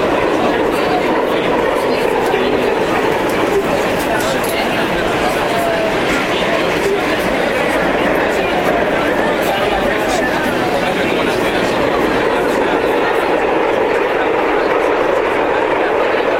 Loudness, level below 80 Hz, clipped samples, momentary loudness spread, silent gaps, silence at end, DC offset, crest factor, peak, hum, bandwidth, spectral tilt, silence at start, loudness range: -15 LUFS; -38 dBFS; under 0.1%; 1 LU; none; 0 s; under 0.1%; 14 dB; 0 dBFS; none; 16.5 kHz; -4.5 dB/octave; 0 s; 1 LU